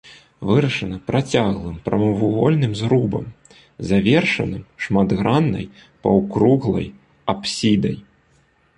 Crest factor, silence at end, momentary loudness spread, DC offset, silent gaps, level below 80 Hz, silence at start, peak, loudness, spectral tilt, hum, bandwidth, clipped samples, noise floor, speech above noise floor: 16 dB; 0.75 s; 12 LU; under 0.1%; none; -44 dBFS; 0.05 s; -2 dBFS; -19 LUFS; -6.5 dB/octave; none; 10.5 kHz; under 0.1%; -58 dBFS; 40 dB